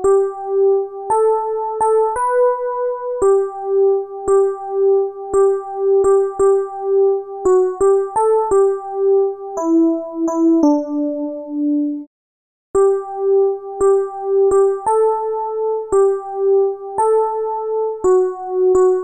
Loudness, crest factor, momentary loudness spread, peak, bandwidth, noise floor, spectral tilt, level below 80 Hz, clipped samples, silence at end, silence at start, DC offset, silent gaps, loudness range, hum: -17 LUFS; 14 dB; 6 LU; -2 dBFS; 11 kHz; under -90 dBFS; -6.5 dB/octave; -50 dBFS; under 0.1%; 0 s; 0 s; under 0.1%; 12.07-12.74 s; 2 LU; none